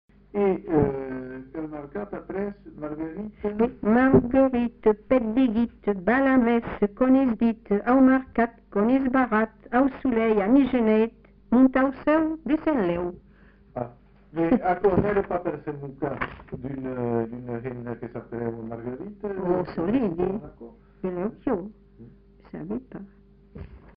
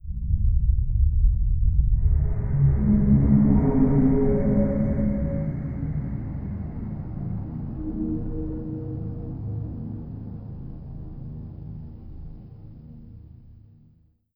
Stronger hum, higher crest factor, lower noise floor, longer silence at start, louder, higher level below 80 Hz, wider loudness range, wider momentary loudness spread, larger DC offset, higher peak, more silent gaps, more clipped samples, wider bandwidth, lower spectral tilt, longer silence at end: neither; about the same, 18 dB vs 18 dB; second, -53 dBFS vs -59 dBFS; first, 0.35 s vs 0.05 s; about the same, -24 LUFS vs -24 LUFS; second, -48 dBFS vs -28 dBFS; second, 10 LU vs 19 LU; second, 16 LU vs 19 LU; neither; about the same, -6 dBFS vs -6 dBFS; neither; neither; first, 4.9 kHz vs 2.5 kHz; second, -7 dB/octave vs -14 dB/octave; second, 0.2 s vs 0.85 s